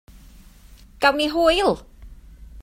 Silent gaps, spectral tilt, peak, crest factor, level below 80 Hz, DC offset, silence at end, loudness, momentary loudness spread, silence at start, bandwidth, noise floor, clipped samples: none; -4 dB/octave; -2 dBFS; 20 dB; -42 dBFS; under 0.1%; 0 s; -20 LUFS; 5 LU; 1 s; 16 kHz; -47 dBFS; under 0.1%